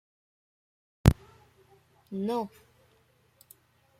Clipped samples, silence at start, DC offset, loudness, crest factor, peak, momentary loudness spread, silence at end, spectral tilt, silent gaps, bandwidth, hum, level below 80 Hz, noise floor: under 0.1%; 1.05 s; under 0.1%; -29 LUFS; 30 dB; -2 dBFS; 16 LU; 1.5 s; -7 dB/octave; none; 16.5 kHz; none; -42 dBFS; -66 dBFS